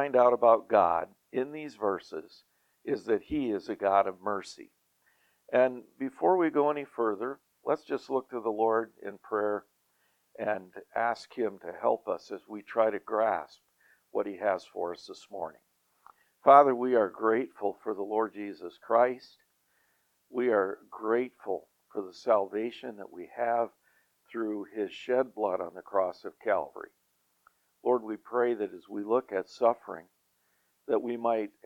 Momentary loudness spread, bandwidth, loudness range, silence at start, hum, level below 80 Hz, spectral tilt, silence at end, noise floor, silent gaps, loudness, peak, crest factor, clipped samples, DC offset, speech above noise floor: 16 LU; 10 kHz; 7 LU; 0 s; none; -72 dBFS; -6.5 dB/octave; 0.2 s; -73 dBFS; none; -30 LUFS; -6 dBFS; 24 dB; under 0.1%; under 0.1%; 44 dB